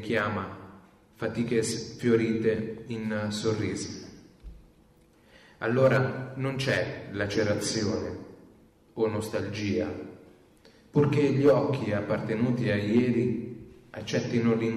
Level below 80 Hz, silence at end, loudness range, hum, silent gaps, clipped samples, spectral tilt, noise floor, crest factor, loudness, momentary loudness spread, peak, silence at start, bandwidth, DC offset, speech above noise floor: -58 dBFS; 0 s; 6 LU; none; none; under 0.1%; -6 dB/octave; -60 dBFS; 16 dB; -28 LUFS; 17 LU; -12 dBFS; 0 s; 13.5 kHz; under 0.1%; 33 dB